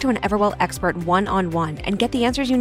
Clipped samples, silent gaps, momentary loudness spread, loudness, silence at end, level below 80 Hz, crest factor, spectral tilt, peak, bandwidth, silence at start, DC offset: under 0.1%; none; 4 LU; -21 LUFS; 0 s; -40 dBFS; 14 dB; -5.5 dB/octave; -6 dBFS; 16 kHz; 0 s; under 0.1%